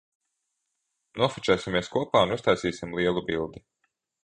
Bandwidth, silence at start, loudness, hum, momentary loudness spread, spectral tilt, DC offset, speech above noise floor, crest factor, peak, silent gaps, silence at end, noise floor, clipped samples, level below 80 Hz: 10 kHz; 1.15 s; -26 LUFS; none; 8 LU; -5 dB/octave; under 0.1%; 54 dB; 22 dB; -6 dBFS; none; 0.7 s; -80 dBFS; under 0.1%; -54 dBFS